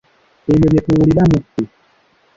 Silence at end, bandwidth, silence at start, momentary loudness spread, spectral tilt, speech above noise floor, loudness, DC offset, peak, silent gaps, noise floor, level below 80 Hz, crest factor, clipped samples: 0.7 s; 7.6 kHz; 0.5 s; 14 LU; -9 dB/octave; 43 dB; -14 LUFS; under 0.1%; -2 dBFS; none; -55 dBFS; -34 dBFS; 14 dB; under 0.1%